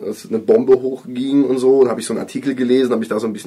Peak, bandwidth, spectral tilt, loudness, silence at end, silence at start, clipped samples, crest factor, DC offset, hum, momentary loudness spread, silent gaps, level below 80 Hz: -4 dBFS; 12.5 kHz; -6 dB/octave; -16 LUFS; 0 s; 0 s; under 0.1%; 12 dB; under 0.1%; none; 10 LU; none; -62 dBFS